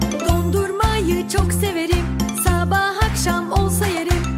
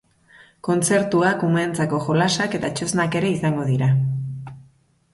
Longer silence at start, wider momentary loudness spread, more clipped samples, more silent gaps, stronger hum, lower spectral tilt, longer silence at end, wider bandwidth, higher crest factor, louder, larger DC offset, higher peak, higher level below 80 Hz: second, 0 s vs 0.65 s; second, 3 LU vs 10 LU; neither; neither; neither; about the same, -5 dB/octave vs -5.5 dB/octave; second, 0 s vs 0.5 s; first, 16 kHz vs 12 kHz; about the same, 16 dB vs 16 dB; about the same, -19 LUFS vs -21 LUFS; neither; first, -2 dBFS vs -6 dBFS; first, -26 dBFS vs -56 dBFS